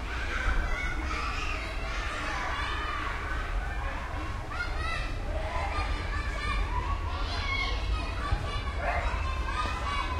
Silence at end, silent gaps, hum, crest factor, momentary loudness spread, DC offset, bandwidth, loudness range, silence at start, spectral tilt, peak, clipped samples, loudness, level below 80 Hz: 0 s; none; none; 16 dB; 4 LU; under 0.1%; 12 kHz; 2 LU; 0 s; -4.5 dB/octave; -16 dBFS; under 0.1%; -32 LUFS; -34 dBFS